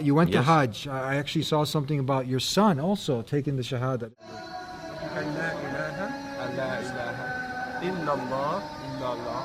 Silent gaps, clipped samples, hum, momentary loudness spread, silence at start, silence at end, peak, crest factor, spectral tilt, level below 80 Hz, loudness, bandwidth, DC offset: none; under 0.1%; none; 12 LU; 0 s; 0 s; -8 dBFS; 20 dB; -6 dB/octave; -58 dBFS; -28 LUFS; 16 kHz; under 0.1%